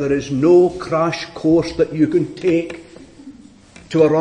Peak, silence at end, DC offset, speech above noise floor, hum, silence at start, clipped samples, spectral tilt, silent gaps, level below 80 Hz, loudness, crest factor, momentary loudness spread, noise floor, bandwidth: -2 dBFS; 0 s; under 0.1%; 27 dB; none; 0 s; under 0.1%; -7 dB/octave; none; -48 dBFS; -17 LUFS; 14 dB; 8 LU; -43 dBFS; 9.6 kHz